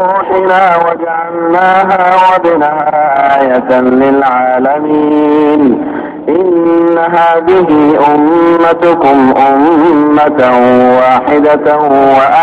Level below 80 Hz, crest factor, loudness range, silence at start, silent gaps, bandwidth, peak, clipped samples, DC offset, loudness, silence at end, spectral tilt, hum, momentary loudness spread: -46 dBFS; 6 dB; 2 LU; 0 s; none; 7.4 kHz; 0 dBFS; under 0.1%; under 0.1%; -7 LUFS; 0 s; -7.5 dB/octave; none; 4 LU